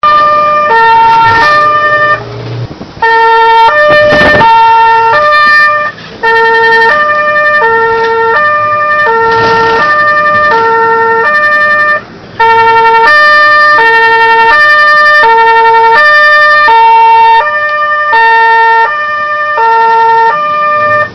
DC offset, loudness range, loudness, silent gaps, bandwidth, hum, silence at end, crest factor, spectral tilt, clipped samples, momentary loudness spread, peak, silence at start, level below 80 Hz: under 0.1%; 3 LU; -4 LUFS; none; 9.8 kHz; none; 0 s; 6 dB; -4 dB/octave; 2%; 6 LU; 0 dBFS; 0.05 s; -38 dBFS